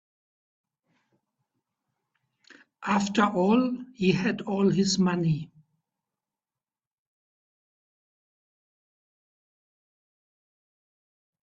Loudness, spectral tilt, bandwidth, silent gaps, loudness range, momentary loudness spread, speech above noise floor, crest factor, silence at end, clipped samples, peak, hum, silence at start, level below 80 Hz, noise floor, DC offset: -25 LUFS; -5.5 dB/octave; 8 kHz; none; 9 LU; 8 LU; over 66 dB; 22 dB; 5.95 s; under 0.1%; -10 dBFS; none; 2.8 s; -68 dBFS; under -90 dBFS; under 0.1%